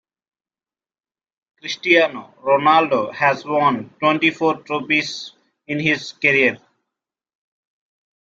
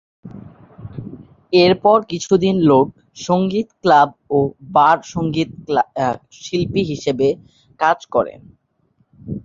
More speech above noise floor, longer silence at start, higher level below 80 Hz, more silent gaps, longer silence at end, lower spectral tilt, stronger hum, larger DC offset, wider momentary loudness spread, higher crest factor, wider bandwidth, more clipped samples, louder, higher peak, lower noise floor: first, over 72 dB vs 46 dB; first, 1.65 s vs 0.25 s; second, -66 dBFS vs -50 dBFS; neither; first, 1.7 s vs 0.05 s; second, -4.5 dB/octave vs -6 dB/octave; neither; neither; second, 13 LU vs 18 LU; about the same, 20 dB vs 18 dB; about the same, 7.8 kHz vs 7.6 kHz; neither; about the same, -18 LUFS vs -17 LUFS; about the same, -2 dBFS vs 0 dBFS; first, under -90 dBFS vs -62 dBFS